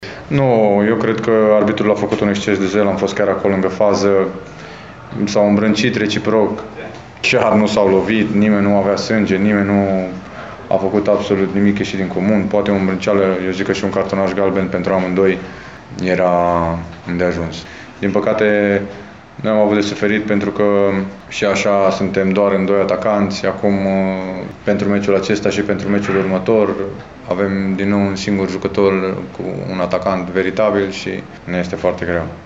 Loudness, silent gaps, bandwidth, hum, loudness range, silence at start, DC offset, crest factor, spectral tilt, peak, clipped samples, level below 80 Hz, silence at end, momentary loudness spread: -16 LUFS; none; 8 kHz; none; 3 LU; 0 s; 0.2%; 14 dB; -6.5 dB/octave; -2 dBFS; under 0.1%; -46 dBFS; 0 s; 11 LU